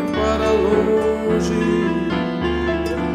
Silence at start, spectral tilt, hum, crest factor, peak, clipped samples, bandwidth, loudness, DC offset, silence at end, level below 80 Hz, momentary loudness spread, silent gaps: 0 s; -6.5 dB/octave; none; 12 dB; -6 dBFS; under 0.1%; 13 kHz; -19 LUFS; under 0.1%; 0 s; -34 dBFS; 5 LU; none